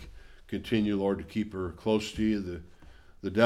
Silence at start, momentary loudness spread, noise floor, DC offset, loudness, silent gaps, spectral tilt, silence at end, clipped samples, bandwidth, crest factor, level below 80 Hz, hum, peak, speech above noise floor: 0 s; 12 LU; -52 dBFS; under 0.1%; -31 LUFS; none; -6.5 dB/octave; 0 s; under 0.1%; 13 kHz; 20 dB; -50 dBFS; none; -10 dBFS; 22 dB